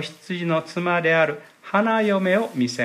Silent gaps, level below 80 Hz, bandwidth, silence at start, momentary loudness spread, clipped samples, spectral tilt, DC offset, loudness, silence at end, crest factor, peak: none; -74 dBFS; 14.5 kHz; 0 s; 8 LU; under 0.1%; -5.5 dB/octave; under 0.1%; -21 LUFS; 0 s; 16 dB; -6 dBFS